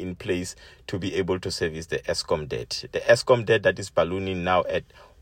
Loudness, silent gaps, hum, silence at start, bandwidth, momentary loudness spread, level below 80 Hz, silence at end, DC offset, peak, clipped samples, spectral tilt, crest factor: -25 LUFS; none; none; 0 s; 16 kHz; 11 LU; -50 dBFS; 0.15 s; under 0.1%; -4 dBFS; under 0.1%; -4.5 dB/octave; 22 dB